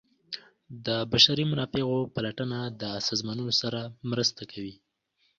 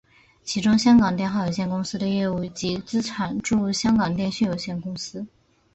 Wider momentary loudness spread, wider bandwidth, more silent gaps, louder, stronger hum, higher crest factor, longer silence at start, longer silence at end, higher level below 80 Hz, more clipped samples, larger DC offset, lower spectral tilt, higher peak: first, 20 LU vs 14 LU; about the same, 7.6 kHz vs 8.2 kHz; neither; second, -27 LUFS vs -23 LUFS; neither; first, 24 dB vs 16 dB; second, 0.3 s vs 0.45 s; first, 0.65 s vs 0.5 s; second, -60 dBFS vs -52 dBFS; neither; neither; second, -4 dB/octave vs -5.5 dB/octave; about the same, -6 dBFS vs -8 dBFS